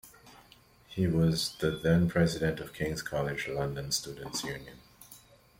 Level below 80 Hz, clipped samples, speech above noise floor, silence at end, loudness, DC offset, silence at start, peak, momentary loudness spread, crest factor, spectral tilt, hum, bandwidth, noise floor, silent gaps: -54 dBFS; under 0.1%; 29 dB; 0.4 s; -31 LUFS; under 0.1%; 0.05 s; -12 dBFS; 16 LU; 18 dB; -5 dB/octave; none; 16.5 kHz; -59 dBFS; none